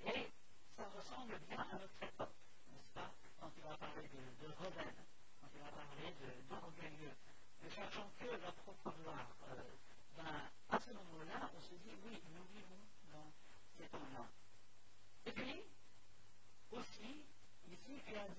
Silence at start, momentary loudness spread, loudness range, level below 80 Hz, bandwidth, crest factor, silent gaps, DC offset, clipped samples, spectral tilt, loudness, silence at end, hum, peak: 0 s; 15 LU; 5 LU; -76 dBFS; 8 kHz; 28 dB; none; 0.3%; under 0.1%; -4.5 dB/octave; -53 LUFS; 0 s; none; -26 dBFS